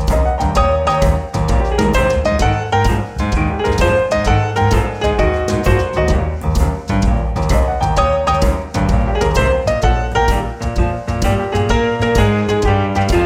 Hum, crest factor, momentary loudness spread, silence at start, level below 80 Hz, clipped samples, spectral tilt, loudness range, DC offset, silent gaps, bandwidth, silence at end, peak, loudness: none; 14 dB; 4 LU; 0 s; -18 dBFS; under 0.1%; -6 dB/octave; 1 LU; under 0.1%; none; 15.5 kHz; 0 s; 0 dBFS; -16 LUFS